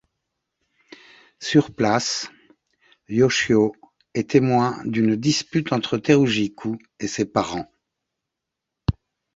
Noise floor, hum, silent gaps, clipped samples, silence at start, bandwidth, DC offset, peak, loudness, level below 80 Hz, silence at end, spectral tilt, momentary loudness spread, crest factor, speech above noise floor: -83 dBFS; none; none; under 0.1%; 1.4 s; 8 kHz; under 0.1%; -2 dBFS; -21 LUFS; -46 dBFS; 0.45 s; -5 dB/octave; 13 LU; 22 dB; 63 dB